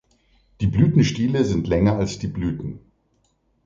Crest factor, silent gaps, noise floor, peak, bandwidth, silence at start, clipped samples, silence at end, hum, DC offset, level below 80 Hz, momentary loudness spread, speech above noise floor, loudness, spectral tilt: 18 dB; none; -66 dBFS; -4 dBFS; 7.6 kHz; 0.6 s; under 0.1%; 0.85 s; none; under 0.1%; -40 dBFS; 12 LU; 46 dB; -21 LUFS; -7 dB/octave